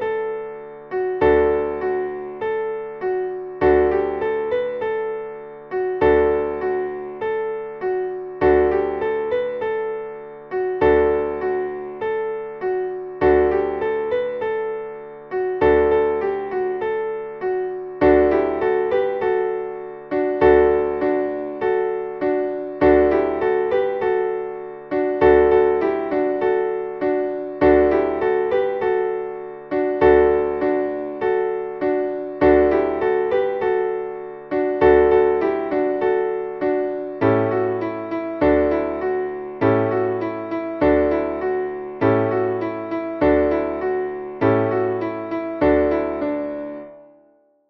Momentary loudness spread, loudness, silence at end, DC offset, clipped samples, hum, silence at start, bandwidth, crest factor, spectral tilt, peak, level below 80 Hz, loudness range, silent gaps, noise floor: 12 LU; -20 LUFS; 0.65 s; under 0.1%; under 0.1%; none; 0 s; 5 kHz; 16 dB; -9.5 dB/octave; -4 dBFS; -42 dBFS; 3 LU; none; -57 dBFS